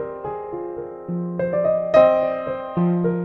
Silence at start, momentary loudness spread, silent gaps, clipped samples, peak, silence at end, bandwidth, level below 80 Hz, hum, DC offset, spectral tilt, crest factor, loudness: 0 s; 15 LU; none; under 0.1%; -2 dBFS; 0 s; 6.2 kHz; -54 dBFS; none; under 0.1%; -9.5 dB/octave; 18 dB; -21 LUFS